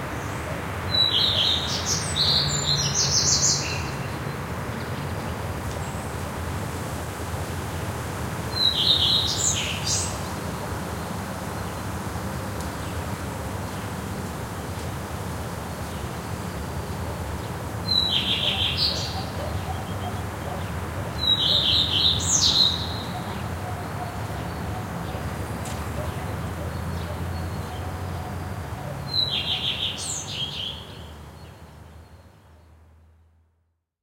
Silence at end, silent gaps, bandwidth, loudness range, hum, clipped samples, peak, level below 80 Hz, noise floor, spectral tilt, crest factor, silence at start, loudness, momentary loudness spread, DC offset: 1.2 s; none; 16.5 kHz; 11 LU; none; under 0.1%; -6 dBFS; -42 dBFS; -71 dBFS; -2.5 dB/octave; 20 dB; 0 s; -25 LUFS; 14 LU; under 0.1%